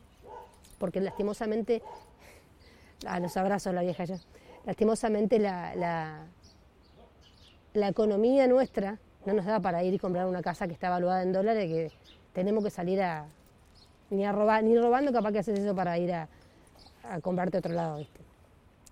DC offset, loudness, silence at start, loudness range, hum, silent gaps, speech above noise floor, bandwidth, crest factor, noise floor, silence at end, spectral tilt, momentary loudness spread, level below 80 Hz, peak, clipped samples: under 0.1%; -29 LUFS; 0.25 s; 5 LU; none; none; 31 dB; 14 kHz; 18 dB; -59 dBFS; 0.7 s; -7 dB/octave; 16 LU; -60 dBFS; -12 dBFS; under 0.1%